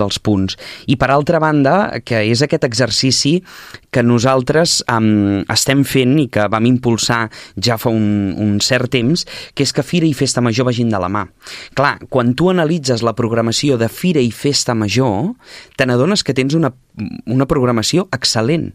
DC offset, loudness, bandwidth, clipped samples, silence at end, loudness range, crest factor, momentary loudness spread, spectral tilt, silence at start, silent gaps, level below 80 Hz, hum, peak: under 0.1%; -15 LUFS; 15.5 kHz; under 0.1%; 0.05 s; 2 LU; 14 dB; 8 LU; -5 dB/octave; 0 s; none; -44 dBFS; none; 0 dBFS